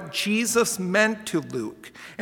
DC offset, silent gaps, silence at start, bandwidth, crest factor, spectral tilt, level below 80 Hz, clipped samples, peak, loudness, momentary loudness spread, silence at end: under 0.1%; none; 0 s; 18 kHz; 18 dB; -3.5 dB/octave; -66 dBFS; under 0.1%; -6 dBFS; -23 LUFS; 16 LU; 0 s